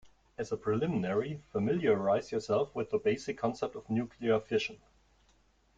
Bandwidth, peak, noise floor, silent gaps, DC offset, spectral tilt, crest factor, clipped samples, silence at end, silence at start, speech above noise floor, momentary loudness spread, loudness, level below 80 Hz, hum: 7.8 kHz; -16 dBFS; -68 dBFS; none; under 0.1%; -6.5 dB/octave; 16 dB; under 0.1%; 1 s; 0.05 s; 36 dB; 9 LU; -33 LUFS; -66 dBFS; none